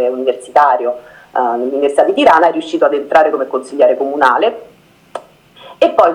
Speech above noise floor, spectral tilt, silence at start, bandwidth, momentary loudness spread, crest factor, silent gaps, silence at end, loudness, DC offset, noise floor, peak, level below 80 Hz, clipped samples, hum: 28 dB; -4 dB/octave; 0 s; 11.5 kHz; 17 LU; 14 dB; none; 0 s; -13 LUFS; under 0.1%; -40 dBFS; 0 dBFS; -56 dBFS; 0.3%; none